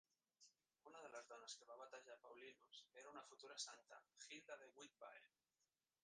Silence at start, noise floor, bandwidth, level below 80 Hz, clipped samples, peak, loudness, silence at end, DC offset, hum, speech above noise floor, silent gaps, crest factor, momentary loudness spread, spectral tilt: 0.4 s; under -90 dBFS; 9.6 kHz; under -90 dBFS; under 0.1%; -38 dBFS; -60 LUFS; 0.4 s; under 0.1%; none; over 29 dB; none; 24 dB; 11 LU; 0 dB/octave